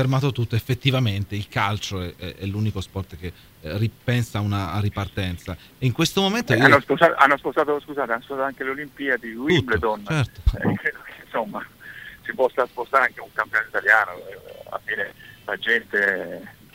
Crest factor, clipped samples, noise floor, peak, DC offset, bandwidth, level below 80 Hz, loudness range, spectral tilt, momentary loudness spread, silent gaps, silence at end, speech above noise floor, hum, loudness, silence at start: 22 dB; under 0.1%; -41 dBFS; 0 dBFS; under 0.1%; 16 kHz; -40 dBFS; 7 LU; -5.5 dB/octave; 17 LU; none; 0.25 s; 18 dB; none; -22 LUFS; 0 s